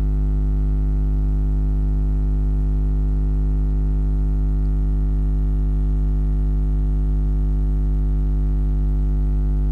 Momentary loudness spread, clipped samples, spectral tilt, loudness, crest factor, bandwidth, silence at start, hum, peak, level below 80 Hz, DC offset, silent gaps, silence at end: 0 LU; under 0.1%; -11 dB/octave; -22 LUFS; 2 dB; 1.9 kHz; 0 s; 50 Hz at -20 dBFS; -16 dBFS; -18 dBFS; under 0.1%; none; 0 s